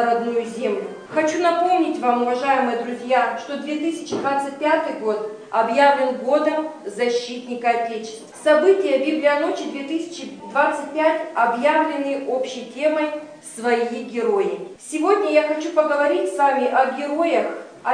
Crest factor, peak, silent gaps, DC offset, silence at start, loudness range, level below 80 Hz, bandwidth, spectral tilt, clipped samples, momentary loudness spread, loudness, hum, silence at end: 18 dB; -4 dBFS; none; under 0.1%; 0 s; 2 LU; -76 dBFS; 10 kHz; -4 dB/octave; under 0.1%; 10 LU; -21 LUFS; none; 0 s